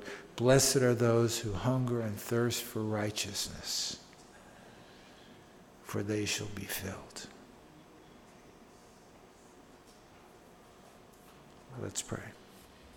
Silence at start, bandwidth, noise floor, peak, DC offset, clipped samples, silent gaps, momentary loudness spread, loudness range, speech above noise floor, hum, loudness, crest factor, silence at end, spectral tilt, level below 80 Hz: 0 s; 18.5 kHz; -57 dBFS; -12 dBFS; under 0.1%; under 0.1%; none; 27 LU; 27 LU; 25 dB; none; -32 LUFS; 24 dB; 0 s; -4.5 dB/octave; -60 dBFS